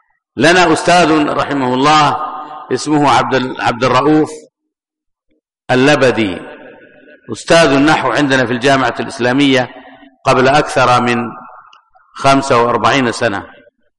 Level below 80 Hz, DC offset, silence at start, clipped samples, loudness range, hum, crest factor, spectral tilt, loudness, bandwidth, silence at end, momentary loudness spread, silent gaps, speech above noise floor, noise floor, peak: -44 dBFS; under 0.1%; 0.35 s; under 0.1%; 3 LU; none; 12 dB; -4.5 dB/octave; -12 LUFS; 11.5 kHz; 0.5 s; 11 LU; none; 64 dB; -76 dBFS; -2 dBFS